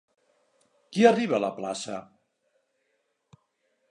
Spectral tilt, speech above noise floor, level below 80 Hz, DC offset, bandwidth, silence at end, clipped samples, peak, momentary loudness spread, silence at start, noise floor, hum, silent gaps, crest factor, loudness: -5 dB/octave; 51 dB; -78 dBFS; under 0.1%; 11 kHz; 1.9 s; under 0.1%; -6 dBFS; 16 LU; 0.9 s; -75 dBFS; none; none; 24 dB; -25 LUFS